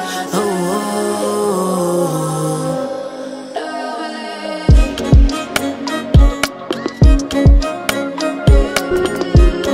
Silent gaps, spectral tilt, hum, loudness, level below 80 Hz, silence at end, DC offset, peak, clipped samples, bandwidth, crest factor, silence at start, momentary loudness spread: none; -6 dB/octave; none; -16 LUFS; -16 dBFS; 0 s; under 0.1%; 0 dBFS; under 0.1%; 15.5 kHz; 14 dB; 0 s; 11 LU